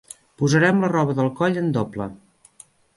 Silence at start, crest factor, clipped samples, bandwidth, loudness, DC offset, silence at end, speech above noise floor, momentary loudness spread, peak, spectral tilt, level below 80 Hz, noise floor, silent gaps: 0.4 s; 18 dB; under 0.1%; 11.5 kHz; -21 LUFS; under 0.1%; 0.8 s; 32 dB; 12 LU; -4 dBFS; -6.5 dB/octave; -58 dBFS; -52 dBFS; none